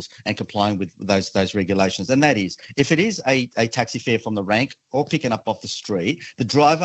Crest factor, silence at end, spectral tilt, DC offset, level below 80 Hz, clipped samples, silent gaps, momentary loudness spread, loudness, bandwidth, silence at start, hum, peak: 18 dB; 0 s; -5 dB/octave; under 0.1%; -58 dBFS; under 0.1%; none; 9 LU; -20 LUFS; 8.4 kHz; 0 s; none; -2 dBFS